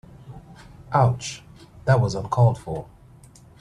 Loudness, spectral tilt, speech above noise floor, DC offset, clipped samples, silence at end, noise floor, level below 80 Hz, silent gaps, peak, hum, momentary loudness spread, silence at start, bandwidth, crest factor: -23 LUFS; -6.5 dB/octave; 28 dB; under 0.1%; under 0.1%; 0.8 s; -49 dBFS; -50 dBFS; none; -6 dBFS; none; 23 LU; 0.25 s; 10.5 kHz; 18 dB